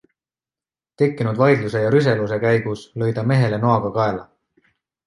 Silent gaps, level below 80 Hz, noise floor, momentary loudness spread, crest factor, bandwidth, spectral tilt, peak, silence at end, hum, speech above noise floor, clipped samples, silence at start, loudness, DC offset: none; -54 dBFS; under -90 dBFS; 7 LU; 18 dB; 11 kHz; -8 dB/octave; -2 dBFS; 0.85 s; none; over 72 dB; under 0.1%; 1 s; -19 LUFS; under 0.1%